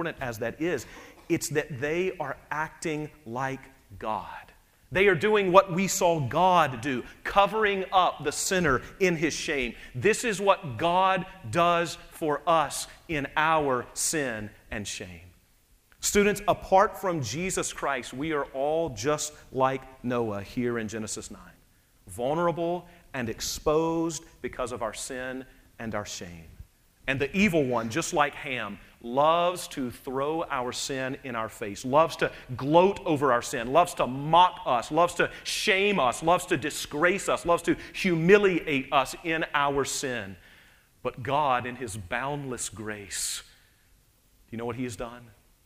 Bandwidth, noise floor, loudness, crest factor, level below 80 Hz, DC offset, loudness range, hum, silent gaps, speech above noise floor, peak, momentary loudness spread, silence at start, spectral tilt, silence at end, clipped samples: 15.5 kHz; -62 dBFS; -27 LUFS; 24 dB; -52 dBFS; under 0.1%; 7 LU; none; none; 36 dB; -4 dBFS; 13 LU; 0 s; -4 dB/octave; 0.4 s; under 0.1%